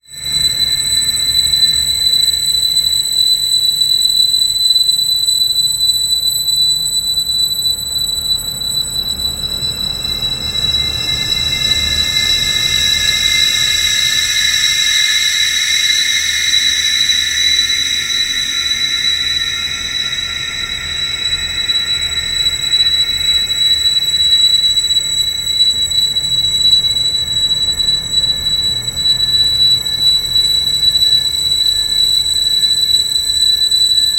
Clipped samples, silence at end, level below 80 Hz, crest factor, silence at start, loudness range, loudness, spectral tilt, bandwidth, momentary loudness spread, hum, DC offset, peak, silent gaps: under 0.1%; 0 s; -36 dBFS; 14 dB; 0.1 s; 5 LU; -11 LUFS; 1 dB/octave; 16 kHz; 6 LU; none; under 0.1%; 0 dBFS; none